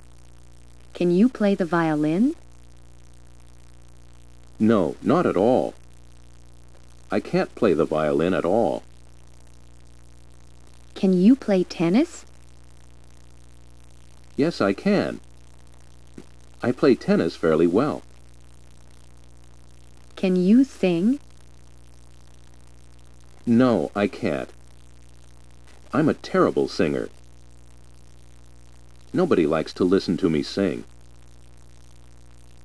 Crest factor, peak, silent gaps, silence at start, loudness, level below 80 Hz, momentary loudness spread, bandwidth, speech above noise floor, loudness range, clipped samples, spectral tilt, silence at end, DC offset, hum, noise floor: 20 dB; -4 dBFS; none; 0.95 s; -22 LUFS; -52 dBFS; 11 LU; 11 kHz; 29 dB; 3 LU; under 0.1%; -7.5 dB/octave; 1.85 s; 0.6%; 60 Hz at -50 dBFS; -49 dBFS